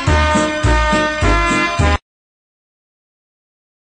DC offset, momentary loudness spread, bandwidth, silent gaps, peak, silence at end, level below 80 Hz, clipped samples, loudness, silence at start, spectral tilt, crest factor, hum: under 0.1%; 3 LU; 10 kHz; none; -2 dBFS; 1.95 s; -22 dBFS; under 0.1%; -15 LUFS; 0 s; -5 dB/octave; 16 dB; none